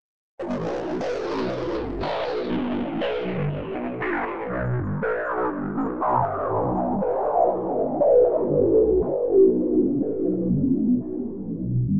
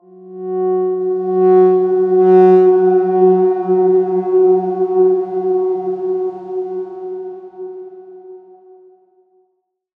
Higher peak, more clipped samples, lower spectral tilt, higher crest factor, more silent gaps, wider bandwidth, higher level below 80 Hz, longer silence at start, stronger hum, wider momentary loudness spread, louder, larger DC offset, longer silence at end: second, -8 dBFS vs -2 dBFS; neither; second, -9 dB/octave vs -11 dB/octave; about the same, 16 dB vs 14 dB; neither; first, 7 kHz vs 2.9 kHz; first, -46 dBFS vs -74 dBFS; first, 0.35 s vs 0.2 s; neither; second, 10 LU vs 19 LU; second, -23 LUFS vs -14 LUFS; first, 0.6% vs under 0.1%; second, 0 s vs 1.6 s